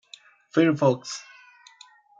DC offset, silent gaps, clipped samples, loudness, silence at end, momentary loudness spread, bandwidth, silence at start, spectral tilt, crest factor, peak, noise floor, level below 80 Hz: under 0.1%; none; under 0.1%; -23 LUFS; 1 s; 16 LU; 7.8 kHz; 0.55 s; -6 dB/octave; 20 dB; -6 dBFS; -54 dBFS; -76 dBFS